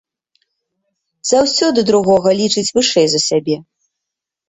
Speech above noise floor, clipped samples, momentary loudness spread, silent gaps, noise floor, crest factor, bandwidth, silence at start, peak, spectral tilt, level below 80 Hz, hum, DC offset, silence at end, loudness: 68 dB; under 0.1%; 7 LU; none; -82 dBFS; 14 dB; 8.4 kHz; 1.25 s; -2 dBFS; -3.5 dB/octave; -54 dBFS; none; under 0.1%; 0.9 s; -14 LUFS